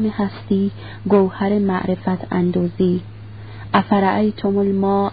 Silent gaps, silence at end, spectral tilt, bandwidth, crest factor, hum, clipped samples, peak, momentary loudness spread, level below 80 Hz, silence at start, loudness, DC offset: none; 0 s; -12.5 dB/octave; 5 kHz; 18 dB; none; under 0.1%; -2 dBFS; 10 LU; -46 dBFS; 0 s; -19 LUFS; 0.5%